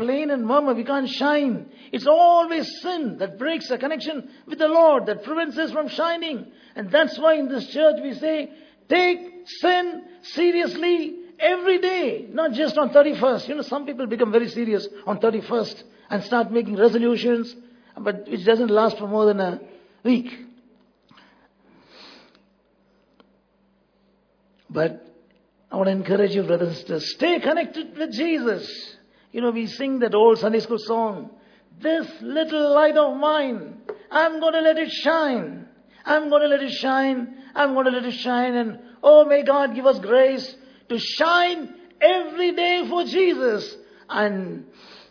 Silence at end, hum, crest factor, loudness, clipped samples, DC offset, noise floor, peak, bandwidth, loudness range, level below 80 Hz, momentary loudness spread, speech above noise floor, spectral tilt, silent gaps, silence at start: 0.15 s; none; 20 dB; -21 LUFS; under 0.1%; under 0.1%; -63 dBFS; -2 dBFS; 5.4 kHz; 6 LU; -72 dBFS; 14 LU; 42 dB; -6 dB/octave; none; 0 s